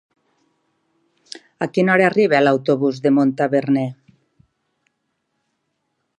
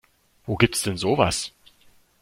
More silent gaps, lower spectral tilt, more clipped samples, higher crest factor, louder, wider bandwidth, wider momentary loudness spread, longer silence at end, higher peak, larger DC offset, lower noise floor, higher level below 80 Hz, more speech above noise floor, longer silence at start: neither; first, -7 dB/octave vs -4 dB/octave; neither; about the same, 18 dB vs 22 dB; first, -17 LUFS vs -23 LUFS; second, 9.6 kHz vs 16.5 kHz; first, 16 LU vs 13 LU; first, 2.25 s vs 0.7 s; about the same, -2 dBFS vs -2 dBFS; neither; first, -73 dBFS vs -57 dBFS; second, -72 dBFS vs -48 dBFS; first, 56 dB vs 34 dB; first, 1.6 s vs 0.45 s